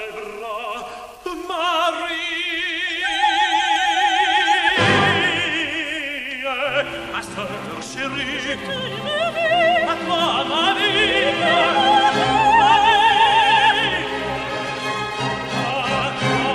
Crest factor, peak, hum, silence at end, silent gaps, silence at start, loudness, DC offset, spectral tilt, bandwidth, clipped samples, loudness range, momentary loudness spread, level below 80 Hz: 16 dB; -2 dBFS; none; 0 s; none; 0 s; -18 LUFS; under 0.1%; -3.5 dB/octave; 13.5 kHz; under 0.1%; 8 LU; 14 LU; -48 dBFS